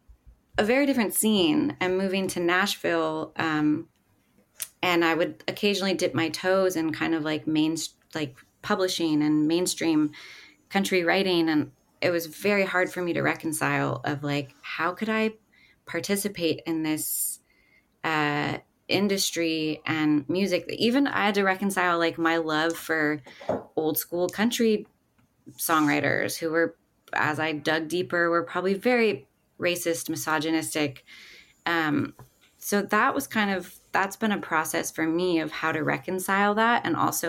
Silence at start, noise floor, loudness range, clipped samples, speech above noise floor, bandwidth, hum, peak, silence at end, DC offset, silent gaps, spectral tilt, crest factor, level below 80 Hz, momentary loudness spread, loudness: 0.1 s; -66 dBFS; 4 LU; under 0.1%; 41 dB; 17 kHz; none; -8 dBFS; 0 s; under 0.1%; none; -4 dB/octave; 18 dB; -64 dBFS; 8 LU; -26 LUFS